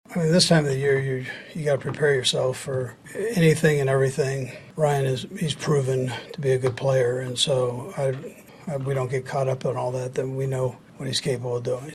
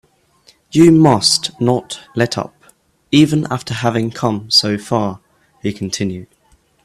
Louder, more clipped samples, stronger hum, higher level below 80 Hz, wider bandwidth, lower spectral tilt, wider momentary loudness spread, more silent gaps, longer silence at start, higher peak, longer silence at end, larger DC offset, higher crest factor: second, -24 LUFS vs -15 LUFS; neither; neither; second, -58 dBFS vs -50 dBFS; about the same, 13 kHz vs 14 kHz; about the same, -5 dB/octave vs -5 dB/octave; second, 11 LU vs 14 LU; neither; second, 0.1 s vs 0.75 s; second, -6 dBFS vs 0 dBFS; second, 0 s vs 0.6 s; neither; about the same, 18 dB vs 16 dB